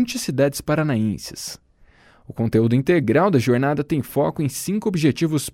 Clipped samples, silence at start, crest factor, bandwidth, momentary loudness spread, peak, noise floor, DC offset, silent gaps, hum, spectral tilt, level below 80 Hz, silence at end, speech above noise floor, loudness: under 0.1%; 0 s; 16 dB; 16.5 kHz; 12 LU; -4 dBFS; -53 dBFS; under 0.1%; none; none; -6 dB/octave; -50 dBFS; 0.05 s; 33 dB; -20 LUFS